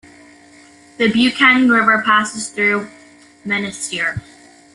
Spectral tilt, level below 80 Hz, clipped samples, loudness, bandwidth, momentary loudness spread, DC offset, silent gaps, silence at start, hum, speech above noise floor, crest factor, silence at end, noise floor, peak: -3.5 dB/octave; -54 dBFS; under 0.1%; -15 LUFS; 11.5 kHz; 12 LU; under 0.1%; none; 1 s; none; 30 dB; 16 dB; 0.55 s; -45 dBFS; -2 dBFS